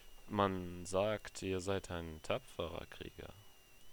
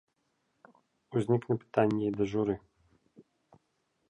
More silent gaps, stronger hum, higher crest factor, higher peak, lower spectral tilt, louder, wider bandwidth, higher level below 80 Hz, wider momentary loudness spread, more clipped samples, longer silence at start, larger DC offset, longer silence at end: neither; neither; about the same, 24 dB vs 22 dB; second, -18 dBFS vs -12 dBFS; second, -5 dB/octave vs -8.5 dB/octave; second, -40 LUFS vs -31 LUFS; first, over 20 kHz vs 10.5 kHz; first, -60 dBFS vs -66 dBFS; first, 14 LU vs 6 LU; neither; second, 0 s vs 1.1 s; neither; second, 0 s vs 0.9 s